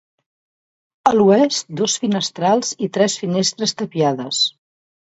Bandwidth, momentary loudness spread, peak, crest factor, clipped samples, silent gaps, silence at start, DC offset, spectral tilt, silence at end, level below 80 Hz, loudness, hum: 8.2 kHz; 7 LU; 0 dBFS; 18 dB; under 0.1%; none; 1.05 s; under 0.1%; -4 dB/octave; 0.55 s; -64 dBFS; -18 LUFS; none